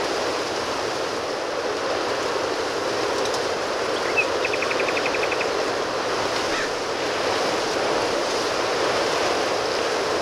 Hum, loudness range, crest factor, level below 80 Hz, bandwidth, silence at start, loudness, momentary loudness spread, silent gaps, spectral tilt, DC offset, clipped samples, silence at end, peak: none; 2 LU; 16 dB; -54 dBFS; 16.5 kHz; 0 s; -23 LUFS; 4 LU; none; -2.5 dB/octave; under 0.1%; under 0.1%; 0 s; -8 dBFS